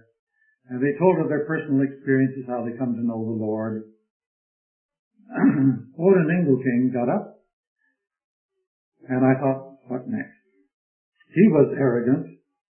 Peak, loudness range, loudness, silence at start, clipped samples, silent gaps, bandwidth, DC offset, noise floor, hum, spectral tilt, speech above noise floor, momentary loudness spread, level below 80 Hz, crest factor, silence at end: -4 dBFS; 5 LU; -22 LUFS; 0.7 s; under 0.1%; 4.10-4.20 s, 4.26-4.89 s, 4.99-5.11 s, 7.53-7.76 s, 8.24-8.49 s, 8.67-8.92 s, 10.74-11.12 s; 3.2 kHz; under 0.1%; under -90 dBFS; none; -13.5 dB/octave; over 69 dB; 13 LU; -68 dBFS; 20 dB; 0.35 s